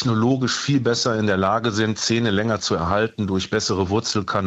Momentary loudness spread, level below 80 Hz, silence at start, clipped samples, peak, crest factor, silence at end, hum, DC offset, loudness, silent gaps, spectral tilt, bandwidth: 2 LU; -50 dBFS; 0 s; under 0.1%; -6 dBFS; 14 dB; 0 s; none; under 0.1%; -21 LUFS; none; -4.5 dB/octave; 8.2 kHz